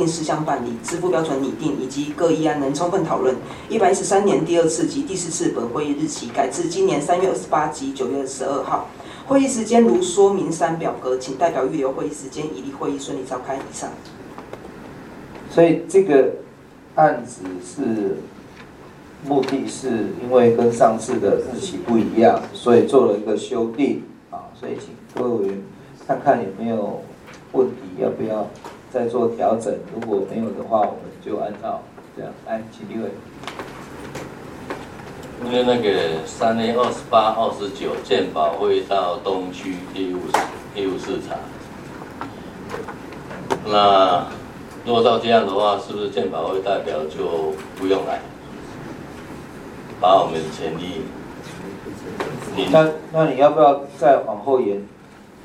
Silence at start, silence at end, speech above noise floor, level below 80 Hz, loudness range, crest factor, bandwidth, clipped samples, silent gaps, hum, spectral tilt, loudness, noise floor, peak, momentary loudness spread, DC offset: 0 s; 0 s; 24 dB; -54 dBFS; 8 LU; 20 dB; 13.5 kHz; under 0.1%; none; none; -5 dB/octave; -20 LUFS; -44 dBFS; 0 dBFS; 19 LU; under 0.1%